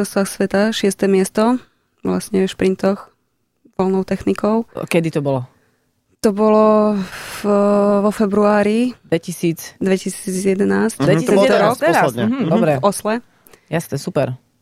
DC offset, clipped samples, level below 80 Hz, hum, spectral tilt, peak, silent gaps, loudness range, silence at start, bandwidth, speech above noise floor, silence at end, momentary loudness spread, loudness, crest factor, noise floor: under 0.1%; under 0.1%; -52 dBFS; none; -6 dB/octave; -2 dBFS; none; 5 LU; 0 s; 15.5 kHz; 51 dB; 0.25 s; 10 LU; -17 LUFS; 14 dB; -67 dBFS